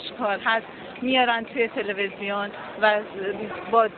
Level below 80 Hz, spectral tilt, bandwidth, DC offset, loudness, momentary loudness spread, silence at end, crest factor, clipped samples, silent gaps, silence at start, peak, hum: -64 dBFS; -7 dB/octave; 4.6 kHz; under 0.1%; -25 LUFS; 10 LU; 0 s; 20 dB; under 0.1%; none; 0 s; -4 dBFS; none